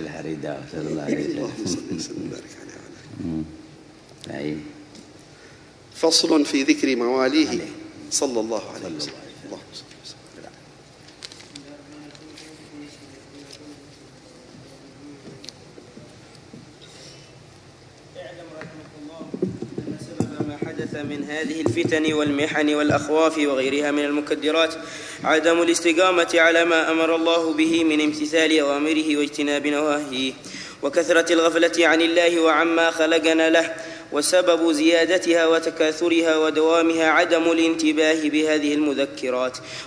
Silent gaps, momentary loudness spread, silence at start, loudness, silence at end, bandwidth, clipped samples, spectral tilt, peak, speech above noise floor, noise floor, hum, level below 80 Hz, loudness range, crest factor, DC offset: none; 23 LU; 0 s; -20 LUFS; 0 s; 11 kHz; under 0.1%; -3.5 dB/octave; -4 dBFS; 27 dB; -47 dBFS; none; -60 dBFS; 19 LU; 18 dB; under 0.1%